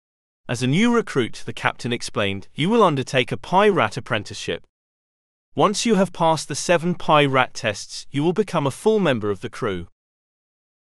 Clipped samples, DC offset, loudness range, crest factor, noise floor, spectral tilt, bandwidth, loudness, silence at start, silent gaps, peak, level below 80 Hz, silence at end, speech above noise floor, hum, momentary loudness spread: under 0.1%; under 0.1%; 2 LU; 22 dB; under -90 dBFS; -5 dB/octave; 12.5 kHz; -21 LUFS; 0.45 s; 4.69-5.52 s; 0 dBFS; -52 dBFS; 1.1 s; over 69 dB; none; 11 LU